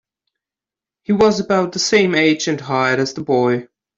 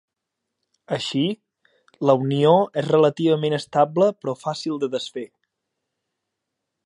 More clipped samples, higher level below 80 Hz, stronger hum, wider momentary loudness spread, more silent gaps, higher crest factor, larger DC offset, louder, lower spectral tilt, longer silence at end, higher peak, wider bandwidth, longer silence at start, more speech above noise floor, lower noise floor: neither; first, -56 dBFS vs -72 dBFS; neither; second, 6 LU vs 12 LU; neither; about the same, 16 dB vs 20 dB; neither; first, -16 LUFS vs -21 LUFS; second, -4.5 dB/octave vs -6.5 dB/octave; second, 0.35 s vs 1.6 s; about the same, -2 dBFS vs -2 dBFS; second, 7.8 kHz vs 11 kHz; first, 1.1 s vs 0.9 s; first, 73 dB vs 61 dB; first, -89 dBFS vs -82 dBFS